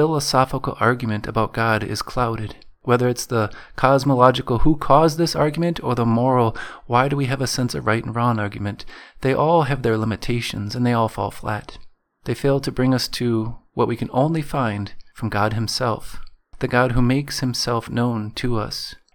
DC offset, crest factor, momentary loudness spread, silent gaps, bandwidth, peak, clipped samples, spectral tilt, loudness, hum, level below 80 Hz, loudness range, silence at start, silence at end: under 0.1%; 20 dB; 11 LU; none; 19 kHz; 0 dBFS; under 0.1%; -6 dB/octave; -21 LUFS; none; -36 dBFS; 5 LU; 0 s; 0.2 s